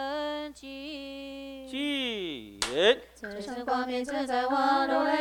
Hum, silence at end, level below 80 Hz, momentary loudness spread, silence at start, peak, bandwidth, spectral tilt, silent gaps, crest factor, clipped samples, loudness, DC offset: none; 0 s; -60 dBFS; 16 LU; 0 s; -10 dBFS; 19 kHz; -2.5 dB/octave; none; 20 dB; under 0.1%; -29 LUFS; under 0.1%